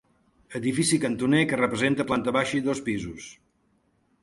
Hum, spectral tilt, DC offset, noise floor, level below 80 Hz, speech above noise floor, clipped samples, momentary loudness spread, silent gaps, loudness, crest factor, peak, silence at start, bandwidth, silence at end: none; -4.5 dB/octave; under 0.1%; -68 dBFS; -58 dBFS; 43 dB; under 0.1%; 15 LU; none; -25 LUFS; 18 dB; -8 dBFS; 0.5 s; 11.5 kHz; 0.9 s